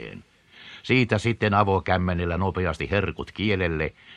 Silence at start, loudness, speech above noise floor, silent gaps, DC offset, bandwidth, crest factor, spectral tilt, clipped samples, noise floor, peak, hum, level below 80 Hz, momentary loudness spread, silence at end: 0 s; -24 LUFS; 23 dB; none; under 0.1%; 10 kHz; 20 dB; -7 dB/octave; under 0.1%; -47 dBFS; -4 dBFS; none; -44 dBFS; 9 LU; 0 s